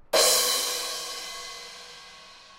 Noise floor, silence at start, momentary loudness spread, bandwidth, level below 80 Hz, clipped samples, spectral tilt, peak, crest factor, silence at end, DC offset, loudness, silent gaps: -49 dBFS; 0.1 s; 24 LU; 16 kHz; -62 dBFS; under 0.1%; 1.5 dB/octave; -6 dBFS; 22 dB; 0 s; under 0.1%; -24 LUFS; none